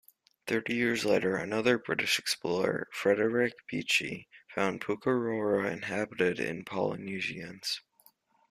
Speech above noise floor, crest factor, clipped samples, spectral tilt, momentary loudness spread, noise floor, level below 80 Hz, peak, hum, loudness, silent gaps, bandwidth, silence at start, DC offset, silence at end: 35 dB; 20 dB; under 0.1%; -4 dB/octave; 8 LU; -65 dBFS; -70 dBFS; -12 dBFS; none; -31 LUFS; none; 15 kHz; 0.45 s; under 0.1%; 0.7 s